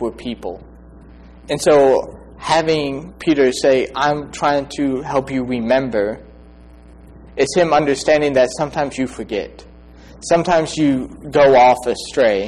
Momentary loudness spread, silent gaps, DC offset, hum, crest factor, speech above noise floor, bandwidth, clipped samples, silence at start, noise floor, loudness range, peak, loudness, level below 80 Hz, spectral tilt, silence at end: 14 LU; none; under 0.1%; none; 12 dB; 25 dB; 12.5 kHz; under 0.1%; 0 s; -42 dBFS; 3 LU; -4 dBFS; -17 LUFS; -44 dBFS; -5 dB/octave; 0 s